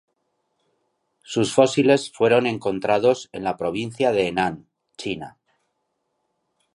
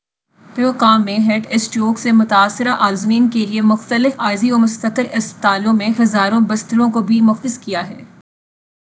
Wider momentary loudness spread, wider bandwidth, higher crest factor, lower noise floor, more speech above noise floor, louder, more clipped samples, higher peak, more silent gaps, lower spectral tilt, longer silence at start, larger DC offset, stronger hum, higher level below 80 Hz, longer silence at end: first, 12 LU vs 7 LU; first, 11.5 kHz vs 8 kHz; about the same, 20 dB vs 16 dB; first, -75 dBFS vs -49 dBFS; first, 54 dB vs 34 dB; second, -21 LUFS vs -15 LUFS; neither; about the same, -2 dBFS vs 0 dBFS; neither; about the same, -5 dB/octave vs -5 dB/octave; first, 1.3 s vs 0.55 s; neither; neither; first, -60 dBFS vs -66 dBFS; first, 1.45 s vs 0.75 s